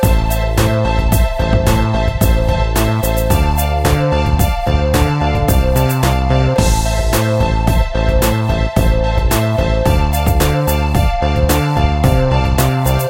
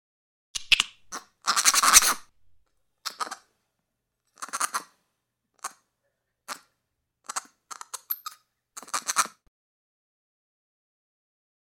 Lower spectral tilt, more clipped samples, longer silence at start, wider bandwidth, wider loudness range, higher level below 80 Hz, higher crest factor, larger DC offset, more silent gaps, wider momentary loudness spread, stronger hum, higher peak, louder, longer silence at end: first, -6 dB/octave vs 2.5 dB/octave; neither; second, 0 s vs 0.55 s; about the same, 17 kHz vs 17 kHz; second, 1 LU vs 16 LU; first, -16 dBFS vs -60 dBFS; second, 12 dB vs 30 dB; neither; neither; second, 2 LU vs 25 LU; neither; about the same, 0 dBFS vs 0 dBFS; first, -14 LUFS vs -23 LUFS; second, 0 s vs 2.35 s